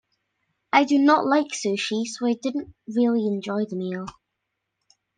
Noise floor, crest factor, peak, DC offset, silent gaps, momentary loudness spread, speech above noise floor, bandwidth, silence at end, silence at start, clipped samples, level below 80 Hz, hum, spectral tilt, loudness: -80 dBFS; 20 dB; -4 dBFS; under 0.1%; none; 12 LU; 57 dB; 9.6 kHz; 1.05 s; 0.75 s; under 0.1%; -66 dBFS; none; -4.5 dB/octave; -23 LUFS